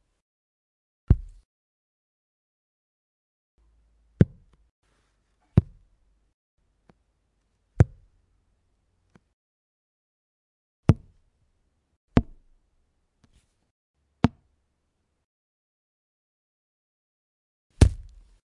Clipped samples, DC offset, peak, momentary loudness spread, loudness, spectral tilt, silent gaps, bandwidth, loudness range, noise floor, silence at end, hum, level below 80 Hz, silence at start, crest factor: under 0.1%; under 0.1%; -2 dBFS; 5 LU; -25 LUFS; -8 dB/octave; 1.45-3.58 s, 4.71-4.82 s, 6.34-6.58 s, 9.33-10.83 s, 11.96-12.08 s, 13.71-13.94 s, 15.24-17.70 s; 11 kHz; 5 LU; -76 dBFS; 0.65 s; none; -38 dBFS; 1.1 s; 30 dB